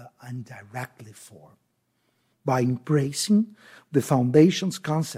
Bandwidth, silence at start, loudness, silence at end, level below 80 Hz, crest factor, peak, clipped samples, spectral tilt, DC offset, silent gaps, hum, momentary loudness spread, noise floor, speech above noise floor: 16 kHz; 0 s; -23 LUFS; 0 s; -68 dBFS; 20 dB; -4 dBFS; under 0.1%; -6 dB/octave; under 0.1%; none; none; 20 LU; -72 dBFS; 48 dB